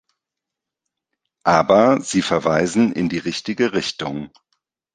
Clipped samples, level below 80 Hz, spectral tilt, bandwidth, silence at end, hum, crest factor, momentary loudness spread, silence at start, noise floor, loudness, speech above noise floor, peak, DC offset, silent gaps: under 0.1%; -54 dBFS; -5 dB/octave; 9.8 kHz; 0.65 s; none; 18 dB; 13 LU; 1.45 s; -84 dBFS; -18 LUFS; 66 dB; -2 dBFS; under 0.1%; none